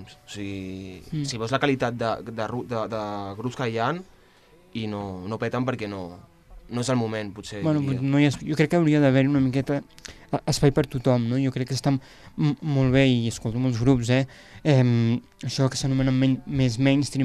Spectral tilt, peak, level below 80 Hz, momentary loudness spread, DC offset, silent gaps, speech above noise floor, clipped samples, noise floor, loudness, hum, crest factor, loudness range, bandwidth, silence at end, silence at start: -6.5 dB/octave; -6 dBFS; -48 dBFS; 14 LU; under 0.1%; none; 31 dB; under 0.1%; -55 dBFS; -24 LUFS; none; 18 dB; 8 LU; 13 kHz; 0 s; 0 s